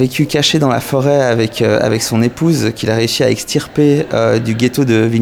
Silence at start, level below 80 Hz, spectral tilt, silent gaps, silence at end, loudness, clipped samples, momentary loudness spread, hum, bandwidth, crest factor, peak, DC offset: 0 s; -46 dBFS; -5.5 dB/octave; none; 0 s; -13 LUFS; under 0.1%; 3 LU; none; 18.5 kHz; 12 dB; 0 dBFS; under 0.1%